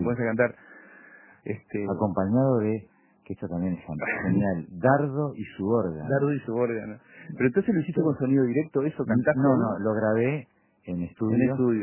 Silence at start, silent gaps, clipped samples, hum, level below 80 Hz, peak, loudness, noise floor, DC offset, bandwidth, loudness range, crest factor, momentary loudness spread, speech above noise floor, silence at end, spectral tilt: 0 s; none; under 0.1%; none; -56 dBFS; -6 dBFS; -26 LUFS; -52 dBFS; under 0.1%; 3.2 kHz; 4 LU; 20 dB; 12 LU; 27 dB; 0 s; -12.5 dB/octave